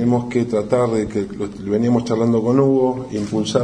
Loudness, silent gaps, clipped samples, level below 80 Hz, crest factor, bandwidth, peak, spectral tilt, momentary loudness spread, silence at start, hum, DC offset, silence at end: -19 LUFS; none; under 0.1%; -48 dBFS; 14 dB; 10 kHz; -2 dBFS; -7 dB/octave; 8 LU; 0 s; none; under 0.1%; 0 s